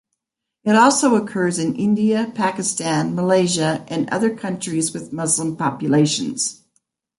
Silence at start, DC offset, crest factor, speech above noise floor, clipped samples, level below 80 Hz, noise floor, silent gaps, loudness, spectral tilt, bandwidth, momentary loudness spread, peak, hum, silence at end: 0.65 s; under 0.1%; 18 dB; 61 dB; under 0.1%; -62 dBFS; -80 dBFS; none; -19 LUFS; -4.5 dB/octave; 11.5 kHz; 9 LU; -2 dBFS; none; 0.65 s